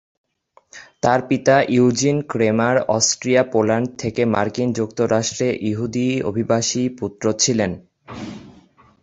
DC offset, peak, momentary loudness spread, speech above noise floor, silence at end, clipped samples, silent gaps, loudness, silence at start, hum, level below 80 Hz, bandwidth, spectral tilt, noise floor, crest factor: under 0.1%; -2 dBFS; 9 LU; 34 dB; 0.5 s; under 0.1%; none; -19 LUFS; 0.75 s; none; -52 dBFS; 8.2 kHz; -4.5 dB/octave; -53 dBFS; 18 dB